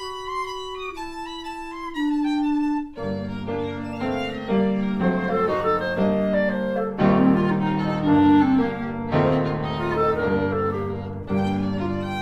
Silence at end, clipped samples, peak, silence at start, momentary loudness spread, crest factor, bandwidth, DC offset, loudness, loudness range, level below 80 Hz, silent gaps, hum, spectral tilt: 0 s; under 0.1%; -6 dBFS; 0 s; 13 LU; 16 dB; 10 kHz; under 0.1%; -23 LUFS; 7 LU; -46 dBFS; none; none; -8 dB/octave